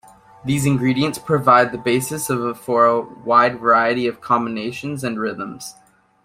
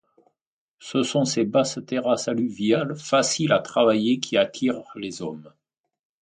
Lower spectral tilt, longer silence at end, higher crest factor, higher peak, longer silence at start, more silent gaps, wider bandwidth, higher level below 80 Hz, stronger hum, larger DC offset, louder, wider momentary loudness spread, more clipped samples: about the same, -5.5 dB/octave vs -4.5 dB/octave; second, 0.55 s vs 0.75 s; about the same, 18 dB vs 20 dB; first, 0 dBFS vs -4 dBFS; second, 0.45 s vs 0.8 s; neither; first, 16 kHz vs 9.6 kHz; first, -56 dBFS vs -66 dBFS; neither; neither; first, -18 LUFS vs -23 LUFS; about the same, 12 LU vs 12 LU; neither